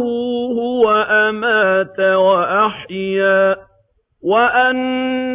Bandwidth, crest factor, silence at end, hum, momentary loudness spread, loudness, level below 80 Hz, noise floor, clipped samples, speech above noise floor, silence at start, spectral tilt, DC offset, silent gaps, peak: 4 kHz; 12 dB; 0 s; none; 7 LU; -15 LUFS; -56 dBFS; -59 dBFS; under 0.1%; 45 dB; 0 s; -8.5 dB/octave; under 0.1%; none; -2 dBFS